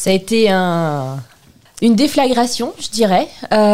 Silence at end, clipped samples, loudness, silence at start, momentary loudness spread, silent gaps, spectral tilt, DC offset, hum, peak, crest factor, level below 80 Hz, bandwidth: 0 s; under 0.1%; -15 LUFS; 0 s; 8 LU; none; -5 dB/octave; 2%; none; -2 dBFS; 12 dB; -50 dBFS; 16 kHz